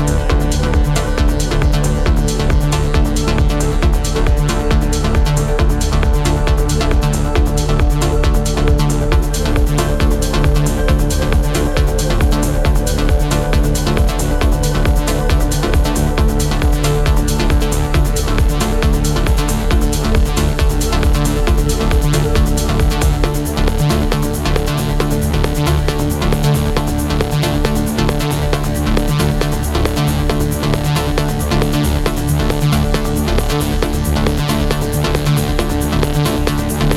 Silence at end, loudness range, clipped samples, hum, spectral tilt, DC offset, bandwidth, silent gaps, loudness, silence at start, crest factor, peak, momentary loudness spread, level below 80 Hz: 0 s; 1 LU; under 0.1%; none; -5.5 dB/octave; under 0.1%; 16 kHz; none; -16 LUFS; 0 s; 12 dB; -2 dBFS; 2 LU; -16 dBFS